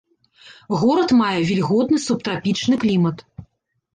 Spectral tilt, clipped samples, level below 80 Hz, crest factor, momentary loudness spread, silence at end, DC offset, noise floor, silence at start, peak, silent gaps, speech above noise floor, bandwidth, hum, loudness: -6 dB/octave; under 0.1%; -56 dBFS; 12 dB; 6 LU; 0.55 s; under 0.1%; -49 dBFS; 0.45 s; -8 dBFS; none; 30 dB; 9.6 kHz; none; -19 LUFS